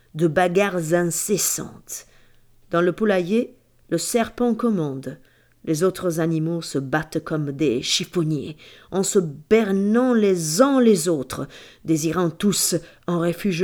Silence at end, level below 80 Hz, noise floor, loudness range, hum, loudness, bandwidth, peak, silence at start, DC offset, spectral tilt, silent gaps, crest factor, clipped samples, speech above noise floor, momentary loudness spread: 0 s; -56 dBFS; -52 dBFS; 4 LU; none; -21 LUFS; over 20 kHz; -2 dBFS; 0.15 s; under 0.1%; -4.5 dB/octave; none; 18 dB; under 0.1%; 31 dB; 13 LU